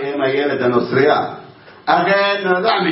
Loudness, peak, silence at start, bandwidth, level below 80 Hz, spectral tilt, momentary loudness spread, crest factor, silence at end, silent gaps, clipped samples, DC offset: -16 LUFS; 0 dBFS; 0 s; 5.8 kHz; -62 dBFS; -9.5 dB/octave; 9 LU; 16 dB; 0 s; none; under 0.1%; under 0.1%